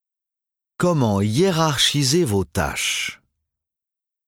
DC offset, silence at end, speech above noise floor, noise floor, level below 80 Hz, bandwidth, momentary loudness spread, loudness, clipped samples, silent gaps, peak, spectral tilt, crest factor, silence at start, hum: under 0.1%; 1.15 s; 68 dB; -87 dBFS; -46 dBFS; 17.5 kHz; 7 LU; -19 LUFS; under 0.1%; none; -6 dBFS; -4 dB/octave; 16 dB; 0.8 s; none